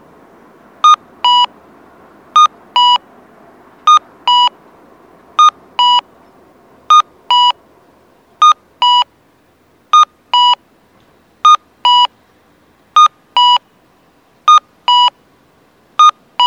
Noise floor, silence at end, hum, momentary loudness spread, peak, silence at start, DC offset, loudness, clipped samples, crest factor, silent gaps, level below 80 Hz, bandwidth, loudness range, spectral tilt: -51 dBFS; 0 s; none; 5 LU; 0 dBFS; 0.85 s; under 0.1%; -10 LUFS; under 0.1%; 12 dB; none; -66 dBFS; 9 kHz; 1 LU; 1.5 dB/octave